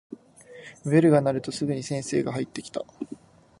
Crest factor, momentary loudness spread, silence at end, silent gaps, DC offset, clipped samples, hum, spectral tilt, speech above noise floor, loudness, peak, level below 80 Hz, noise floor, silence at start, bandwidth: 20 dB; 25 LU; 0.45 s; none; under 0.1%; under 0.1%; none; -6.5 dB/octave; 24 dB; -25 LUFS; -6 dBFS; -64 dBFS; -49 dBFS; 0.1 s; 11.5 kHz